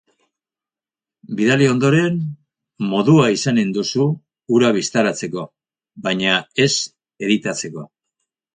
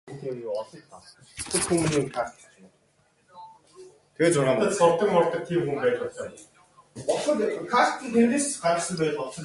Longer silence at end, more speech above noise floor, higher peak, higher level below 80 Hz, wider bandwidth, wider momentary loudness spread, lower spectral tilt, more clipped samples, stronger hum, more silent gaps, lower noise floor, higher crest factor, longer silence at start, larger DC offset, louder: first, 0.7 s vs 0 s; first, over 73 dB vs 40 dB; first, -2 dBFS vs -6 dBFS; about the same, -60 dBFS vs -60 dBFS; second, 9.6 kHz vs 11.5 kHz; about the same, 15 LU vs 13 LU; about the same, -5 dB/octave vs -4.5 dB/octave; neither; neither; neither; first, under -90 dBFS vs -65 dBFS; about the same, 18 dB vs 20 dB; first, 1.3 s vs 0.05 s; neither; first, -18 LUFS vs -25 LUFS